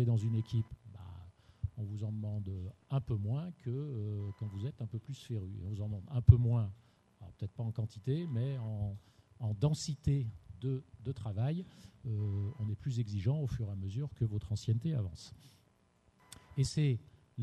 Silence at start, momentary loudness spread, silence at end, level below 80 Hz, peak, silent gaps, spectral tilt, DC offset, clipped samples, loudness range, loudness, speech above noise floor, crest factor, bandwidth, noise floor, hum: 0 s; 12 LU; 0 s; -52 dBFS; -8 dBFS; none; -7.5 dB/octave; under 0.1%; under 0.1%; 6 LU; -37 LUFS; 35 dB; 28 dB; 9.8 kHz; -70 dBFS; none